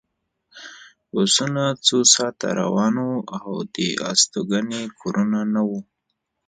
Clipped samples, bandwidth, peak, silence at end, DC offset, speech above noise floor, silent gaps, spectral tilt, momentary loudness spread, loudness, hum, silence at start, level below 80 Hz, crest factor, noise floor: under 0.1%; 9.6 kHz; -2 dBFS; 0.65 s; under 0.1%; 56 dB; none; -3 dB/octave; 14 LU; -20 LUFS; none; 0.55 s; -66 dBFS; 22 dB; -77 dBFS